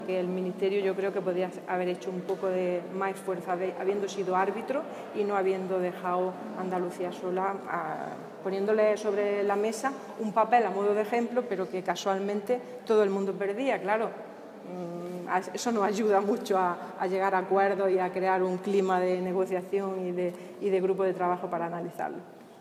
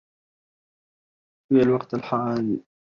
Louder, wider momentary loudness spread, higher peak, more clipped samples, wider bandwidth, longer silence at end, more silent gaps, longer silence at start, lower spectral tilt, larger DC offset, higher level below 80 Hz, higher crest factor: second, -29 LUFS vs -23 LUFS; about the same, 9 LU vs 7 LU; about the same, -10 dBFS vs -8 dBFS; neither; first, 14.5 kHz vs 6.8 kHz; second, 0 s vs 0.25 s; neither; second, 0 s vs 1.5 s; second, -6 dB/octave vs -9 dB/octave; neither; second, -84 dBFS vs -62 dBFS; about the same, 18 dB vs 18 dB